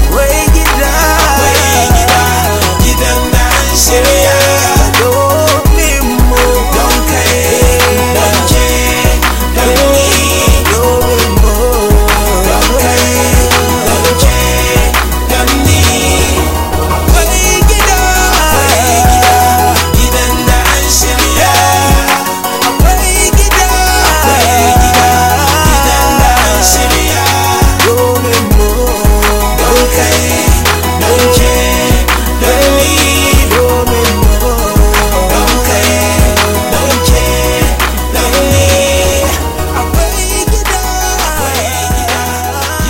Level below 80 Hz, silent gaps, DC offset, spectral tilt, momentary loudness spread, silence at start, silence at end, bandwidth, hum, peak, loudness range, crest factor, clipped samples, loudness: -14 dBFS; none; under 0.1%; -3.5 dB/octave; 4 LU; 0 s; 0 s; 17 kHz; none; 0 dBFS; 2 LU; 8 dB; 0.2%; -8 LUFS